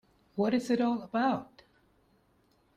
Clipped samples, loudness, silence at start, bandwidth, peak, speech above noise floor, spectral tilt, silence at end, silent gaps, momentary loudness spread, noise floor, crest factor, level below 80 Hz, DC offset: under 0.1%; -31 LUFS; 0.35 s; 10.5 kHz; -16 dBFS; 40 dB; -6 dB/octave; 1.35 s; none; 7 LU; -69 dBFS; 16 dB; -72 dBFS; under 0.1%